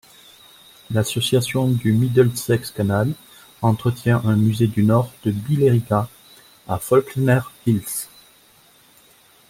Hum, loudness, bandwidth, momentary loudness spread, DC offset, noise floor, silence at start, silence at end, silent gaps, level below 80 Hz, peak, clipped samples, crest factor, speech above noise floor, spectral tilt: none; -20 LUFS; 16.5 kHz; 8 LU; under 0.1%; -53 dBFS; 0.9 s; 1.45 s; none; -54 dBFS; -4 dBFS; under 0.1%; 16 dB; 34 dB; -6.5 dB/octave